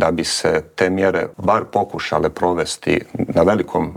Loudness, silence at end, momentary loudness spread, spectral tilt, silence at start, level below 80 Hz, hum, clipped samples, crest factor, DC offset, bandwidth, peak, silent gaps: -18 LUFS; 0 s; 4 LU; -4.5 dB/octave; 0 s; -48 dBFS; none; under 0.1%; 18 dB; under 0.1%; 16.5 kHz; 0 dBFS; none